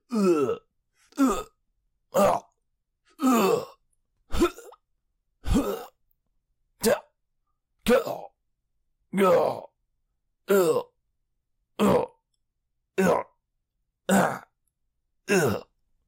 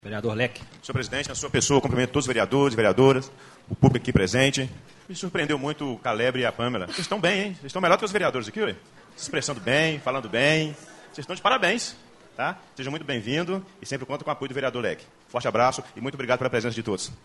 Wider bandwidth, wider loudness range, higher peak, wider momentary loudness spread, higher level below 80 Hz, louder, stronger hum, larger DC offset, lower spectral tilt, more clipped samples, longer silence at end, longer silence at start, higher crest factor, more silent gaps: first, 16 kHz vs 11.5 kHz; about the same, 4 LU vs 5 LU; second, -10 dBFS vs -2 dBFS; first, 16 LU vs 13 LU; first, -44 dBFS vs -50 dBFS; about the same, -25 LUFS vs -25 LUFS; neither; neither; about the same, -5.5 dB/octave vs -4.5 dB/octave; neither; first, 0.45 s vs 0.1 s; about the same, 0.1 s vs 0.05 s; second, 18 dB vs 24 dB; neither